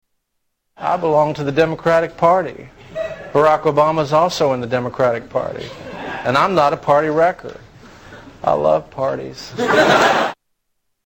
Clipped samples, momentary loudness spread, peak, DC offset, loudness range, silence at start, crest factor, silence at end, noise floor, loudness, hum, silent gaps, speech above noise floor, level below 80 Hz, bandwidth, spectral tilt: under 0.1%; 14 LU; -2 dBFS; under 0.1%; 2 LU; 0.8 s; 16 dB; 0.75 s; -72 dBFS; -17 LUFS; none; none; 56 dB; -50 dBFS; 17 kHz; -5.5 dB/octave